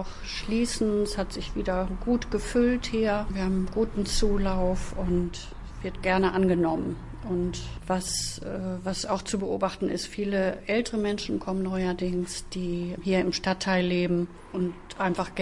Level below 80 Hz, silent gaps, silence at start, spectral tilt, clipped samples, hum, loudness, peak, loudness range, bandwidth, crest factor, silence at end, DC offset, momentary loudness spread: -38 dBFS; none; 0 s; -5 dB/octave; under 0.1%; none; -28 LUFS; -10 dBFS; 2 LU; 11.5 kHz; 16 dB; 0 s; under 0.1%; 8 LU